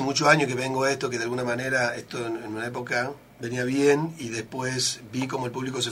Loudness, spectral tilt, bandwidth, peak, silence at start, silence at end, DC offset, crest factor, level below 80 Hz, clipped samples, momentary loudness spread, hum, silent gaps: -26 LUFS; -4 dB/octave; 16 kHz; -4 dBFS; 0 s; 0 s; under 0.1%; 22 dB; -64 dBFS; under 0.1%; 11 LU; none; none